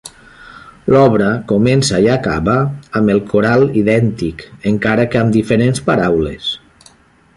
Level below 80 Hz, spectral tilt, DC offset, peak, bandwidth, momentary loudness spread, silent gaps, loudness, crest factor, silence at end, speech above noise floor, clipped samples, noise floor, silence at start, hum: -38 dBFS; -6 dB/octave; under 0.1%; 0 dBFS; 11.5 kHz; 10 LU; none; -14 LUFS; 14 dB; 0.8 s; 34 dB; under 0.1%; -47 dBFS; 0.05 s; none